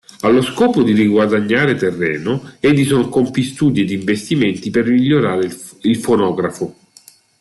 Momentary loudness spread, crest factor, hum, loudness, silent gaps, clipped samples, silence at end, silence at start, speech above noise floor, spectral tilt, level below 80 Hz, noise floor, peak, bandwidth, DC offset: 8 LU; 12 dB; none; -15 LUFS; none; under 0.1%; 0.7 s; 0.25 s; 32 dB; -6 dB/octave; -52 dBFS; -47 dBFS; -2 dBFS; 12.5 kHz; under 0.1%